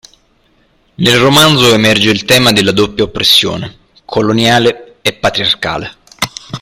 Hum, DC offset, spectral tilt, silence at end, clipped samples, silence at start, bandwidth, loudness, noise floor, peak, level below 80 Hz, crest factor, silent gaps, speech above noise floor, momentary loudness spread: none; under 0.1%; -4 dB/octave; 0.05 s; 0.2%; 1 s; over 20 kHz; -9 LUFS; -53 dBFS; 0 dBFS; -40 dBFS; 12 dB; none; 43 dB; 13 LU